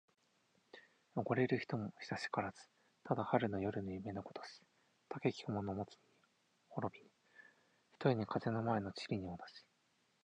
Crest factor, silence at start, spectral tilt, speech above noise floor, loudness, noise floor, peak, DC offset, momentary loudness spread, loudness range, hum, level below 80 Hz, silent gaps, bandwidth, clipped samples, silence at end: 24 dB; 0.75 s; -7 dB/octave; 38 dB; -41 LUFS; -78 dBFS; -18 dBFS; under 0.1%; 22 LU; 6 LU; none; -70 dBFS; none; 9.6 kHz; under 0.1%; 0.65 s